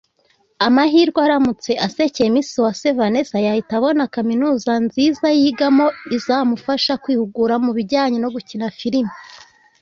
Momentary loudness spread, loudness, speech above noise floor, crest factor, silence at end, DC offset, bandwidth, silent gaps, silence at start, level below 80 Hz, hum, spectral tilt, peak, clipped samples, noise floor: 6 LU; -17 LUFS; 44 dB; 16 dB; 0.45 s; under 0.1%; 7.6 kHz; none; 0.6 s; -58 dBFS; none; -5 dB/octave; -2 dBFS; under 0.1%; -60 dBFS